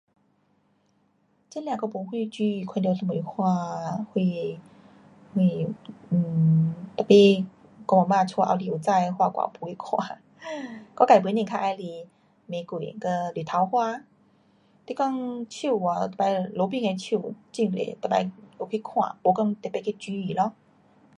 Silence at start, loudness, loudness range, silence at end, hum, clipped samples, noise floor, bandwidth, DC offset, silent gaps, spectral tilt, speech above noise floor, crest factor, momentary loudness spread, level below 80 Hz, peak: 1.5 s; -25 LUFS; 7 LU; 0.7 s; none; under 0.1%; -67 dBFS; 11 kHz; under 0.1%; none; -7 dB/octave; 42 dB; 22 dB; 16 LU; -70 dBFS; -4 dBFS